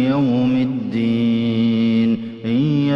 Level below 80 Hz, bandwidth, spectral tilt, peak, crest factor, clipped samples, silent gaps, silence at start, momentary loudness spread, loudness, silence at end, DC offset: -56 dBFS; 5.8 kHz; -9 dB/octave; -8 dBFS; 10 dB; under 0.1%; none; 0 s; 4 LU; -18 LUFS; 0 s; under 0.1%